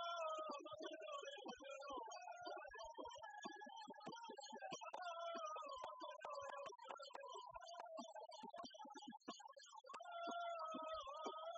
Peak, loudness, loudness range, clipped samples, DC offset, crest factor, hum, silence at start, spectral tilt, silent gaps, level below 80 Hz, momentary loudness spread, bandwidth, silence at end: -36 dBFS; -53 LUFS; 3 LU; under 0.1%; under 0.1%; 16 dB; none; 0 s; -0.5 dB/octave; none; -86 dBFS; 8 LU; 8 kHz; 0 s